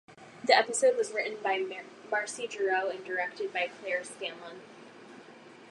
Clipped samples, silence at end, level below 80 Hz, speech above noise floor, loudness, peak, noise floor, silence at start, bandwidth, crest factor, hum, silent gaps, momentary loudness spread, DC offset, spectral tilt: under 0.1%; 0 s; -86 dBFS; 21 dB; -30 LUFS; -6 dBFS; -52 dBFS; 0.1 s; 11.5 kHz; 26 dB; none; none; 25 LU; under 0.1%; -1 dB/octave